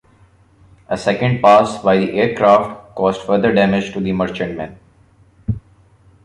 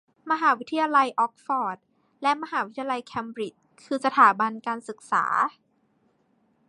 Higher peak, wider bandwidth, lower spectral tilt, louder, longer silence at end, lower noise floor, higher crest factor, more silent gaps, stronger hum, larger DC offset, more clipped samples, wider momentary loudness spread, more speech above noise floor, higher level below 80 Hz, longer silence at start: first, 0 dBFS vs -4 dBFS; about the same, 11 kHz vs 11 kHz; first, -6.5 dB/octave vs -4 dB/octave; first, -16 LUFS vs -25 LUFS; second, 0.65 s vs 1.2 s; second, -51 dBFS vs -67 dBFS; second, 16 dB vs 22 dB; neither; neither; neither; neither; about the same, 15 LU vs 15 LU; second, 36 dB vs 43 dB; first, -44 dBFS vs -78 dBFS; first, 0.9 s vs 0.25 s